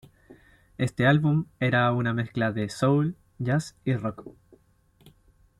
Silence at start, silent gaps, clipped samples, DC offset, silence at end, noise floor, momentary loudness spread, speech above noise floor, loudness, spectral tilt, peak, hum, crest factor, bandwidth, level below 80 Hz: 0.3 s; none; under 0.1%; under 0.1%; 0.5 s; -62 dBFS; 9 LU; 37 dB; -26 LUFS; -7 dB/octave; -10 dBFS; none; 18 dB; 12 kHz; -58 dBFS